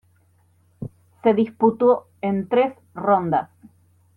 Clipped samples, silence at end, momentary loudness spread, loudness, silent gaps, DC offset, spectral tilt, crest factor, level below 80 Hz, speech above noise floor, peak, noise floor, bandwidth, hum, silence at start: under 0.1%; 0.7 s; 19 LU; -21 LUFS; none; under 0.1%; -9.5 dB/octave; 18 dB; -64 dBFS; 40 dB; -4 dBFS; -60 dBFS; 4.3 kHz; none; 0.8 s